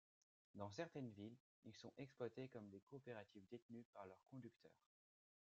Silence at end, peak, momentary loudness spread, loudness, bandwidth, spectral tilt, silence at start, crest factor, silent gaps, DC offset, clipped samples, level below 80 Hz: 0.7 s; -36 dBFS; 9 LU; -58 LUFS; 7.6 kHz; -6 dB/octave; 0.55 s; 22 dB; 1.40-1.62 s, 2.83-2.87 s, 3.62-3.69 s, 3.85-3.93 s; under 0.1%; under 0.1%; under -90 dBFS